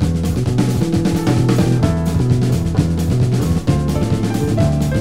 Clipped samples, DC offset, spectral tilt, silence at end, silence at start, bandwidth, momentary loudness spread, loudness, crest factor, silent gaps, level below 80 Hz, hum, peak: under 0.1%; 2%; -7 dB/octave; 0 s; 0 s; 16 kHz; 3 LU; -16 LUFS; 14 dB; none; -28 dBFS; none; -2 dBFS